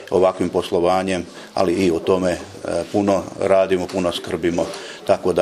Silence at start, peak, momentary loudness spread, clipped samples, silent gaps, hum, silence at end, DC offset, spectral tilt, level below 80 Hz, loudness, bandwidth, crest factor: 0 s; 0 dBFS; 8 LU; under 0.1%; none; none; 0 s; under 0.1%; -5.5 dB/octave; -50 dBFS; -20 LUFS; 14 kHz; 18 dB